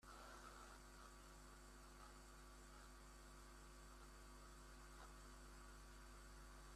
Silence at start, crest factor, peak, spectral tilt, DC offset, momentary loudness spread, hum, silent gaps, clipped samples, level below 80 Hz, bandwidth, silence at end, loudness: 0 s; 14 dB; -48 dBFS; -3.5 dB/octave; under 0.1%; 3 LU; none; none; under 0.1%; -64 dBFS; 14.5 kHz; 0 s; -63 LUFS